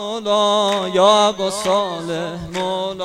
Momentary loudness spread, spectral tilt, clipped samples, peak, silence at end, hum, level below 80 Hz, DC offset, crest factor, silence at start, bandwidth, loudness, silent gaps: 11 LU; -3.5 dB/octave; under 0.1%; -2 dBFS; 0 s; none; -52 dBFS; under 0.1%; 16 dB; 0 s; 15 kHz; -18 LUFS; none